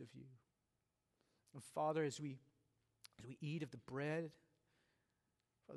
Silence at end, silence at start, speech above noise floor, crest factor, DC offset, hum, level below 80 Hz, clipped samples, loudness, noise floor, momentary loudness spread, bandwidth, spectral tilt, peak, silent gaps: 0 s; 0 s; 42 dB; 20 dB; under 0.1%; none; -86 dBFS; under 0.1%; -46 LUFS; -88 dBFS; 21 LU; 12 kHz; -6 dB/octave; -30 dBFS; none